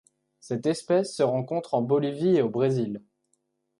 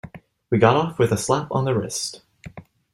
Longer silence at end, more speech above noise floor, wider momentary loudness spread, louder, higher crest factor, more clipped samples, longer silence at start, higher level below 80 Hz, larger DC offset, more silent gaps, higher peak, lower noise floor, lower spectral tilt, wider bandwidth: first, 0.8 s vs 0.35 s; first, 49 dB vs 22 dB; second, 7 LU vs 24 LU; second, -26 LUFS vs -21 LUFS; about the same, 16 dB vs 20 dB; neither; first, 0.45 s vs 0.05 s; second, -72 dBFS vs -54 dBFS; neither; neither; second, -10 dBFS vs -2 dBFS; first, -74 dBFS vs -42 dBFS; first, -7 dB/octave vs -5.5 dB/octave; second, 11.5 kHz vs 13.5 kHz